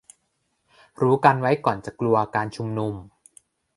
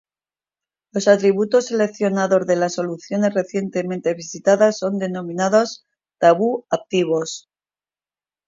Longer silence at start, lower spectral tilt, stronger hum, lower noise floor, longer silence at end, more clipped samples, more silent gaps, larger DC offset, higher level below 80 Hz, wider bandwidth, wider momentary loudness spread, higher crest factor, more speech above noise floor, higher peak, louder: about the same, 1 s vs 0.95 s; first, -7.5 dB/octave vs -5 dB/octave; neither; second, -73 dBFS vs under -90 dBFS; second, 0.7 s vs 1.1 s; neither; neither; neither; first, -58 dBFS vs -70 dBFS; first, 11.5 kHz vs 7.8 kHz; about the same, 10 LU vs 9 LU; first, 24 dB vs 18 dB; second, 51 dB vs over 71 dB; about the same, 0 dBFS vs -2 dBFS; second, -22 LUFS vs -19 LUFS